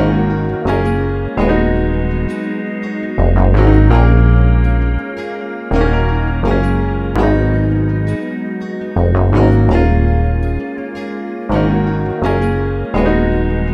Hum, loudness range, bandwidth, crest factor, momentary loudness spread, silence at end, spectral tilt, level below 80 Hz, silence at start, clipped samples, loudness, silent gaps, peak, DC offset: none; 4 LU; 6 kHz; 14 dB; 12 LU; 0 s; -9.5 dB/octave; -18 dBFS; 0 s; under 0.1%; -15 LUFS; none; 0 dBFS; under 0.1%